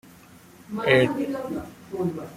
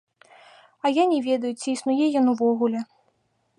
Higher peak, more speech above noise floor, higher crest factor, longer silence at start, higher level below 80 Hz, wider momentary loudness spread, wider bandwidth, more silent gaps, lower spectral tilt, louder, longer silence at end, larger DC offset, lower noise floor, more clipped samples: first, -4 dBFS vs -8 dBFS; second, 25 dB vs 47 dB; first, 22 dB vs 16 dB; second, 0.05 s vs 0.85 s; first, -58 dBFS vs -80 dBFS; first, 16 LU vs 7 LU; first, 16 kHz vs 11 kHz; neither; first, -6 dB/octave vs -4.5 dB/octave; about the same, -24 LUFS vs -23 LUFS; second, 0 s vs 0.75 s; neither; second, -50 dBFS vs -69 dBFS; neither